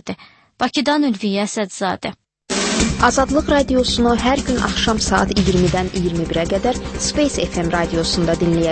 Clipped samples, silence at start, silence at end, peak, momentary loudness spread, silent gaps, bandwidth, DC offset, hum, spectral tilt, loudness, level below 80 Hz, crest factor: under 0.1%; 0.05 s; 0 s; 0 dBFS; 7 LU; none; 8.8 kHz; under 0.1%; none; -4.5 dB/octave; -18 LUFS; -32 dBFS; 18 dB